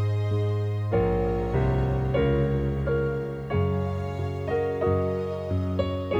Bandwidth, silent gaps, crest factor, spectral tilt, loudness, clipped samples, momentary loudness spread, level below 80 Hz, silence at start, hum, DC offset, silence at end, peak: 7.6 kHz; none; 14 dB; -9 dB/octave; -26 LUFS; under 0.1%; 5 LU; -36 dBFS; 0 s; none; under 0.1%; 0 s; -12 dBFS